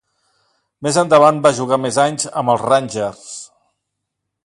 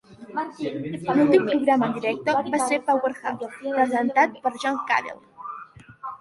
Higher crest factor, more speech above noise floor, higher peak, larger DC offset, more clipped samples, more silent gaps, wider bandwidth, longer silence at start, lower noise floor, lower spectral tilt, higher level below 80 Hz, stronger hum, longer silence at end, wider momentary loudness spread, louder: about the same, 18 dB vs 20 dB; first, 62 dB vs 21 dB; first, 0 dBFS vs -4 dBFS; neither; neither; neither; about the same, 11.5 kHz vs 11.5 kHz; first, 0.8 s vs 0.1 s; first, -77 dBFS vs -44 dBFS; about the same, -4.5 dB/octave vs -5 dB/octave; about the same, -60 dBFS vs -64 dBFS; neither; first, 1 s vs 0.05 s; second, 15 LU vs 18 LU; first, -15 LUFS vs -23 LUFS